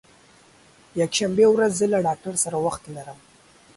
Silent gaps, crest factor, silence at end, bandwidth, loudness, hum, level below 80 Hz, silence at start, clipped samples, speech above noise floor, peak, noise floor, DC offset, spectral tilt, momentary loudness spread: none; 18 dB; 0.65 s; 11.5 kHz; -21 LUFS; none; -60 dBFS; 0.95 s; under 0.1%; 32 dB; -6 dBFS; -54 dBFS; under 0.1%; -4 dB/octave; 19 LU